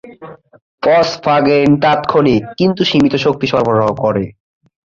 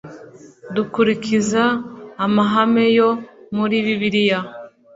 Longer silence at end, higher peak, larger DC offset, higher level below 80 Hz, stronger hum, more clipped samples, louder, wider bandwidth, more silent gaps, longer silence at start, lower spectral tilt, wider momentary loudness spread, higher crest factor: first, 0.55 s vs 0.25 s; about the same, 0 dBFS vs -2 dBFS; neither; first, -46 dBFS vs -60 dBFS; neither; neither; first, -13 LUFS vs -18 LUFS; about the same, 7.4 kHz vs 8 kHz; first, 0.62-0.78 s vs none; about the same, 0.05 s vs 0.05 s; about the same, -6.5 dB/octave vs -5.5 dB/octave; second, 6 LU vs 12 LU; about the same, 12 dB vs 16 dB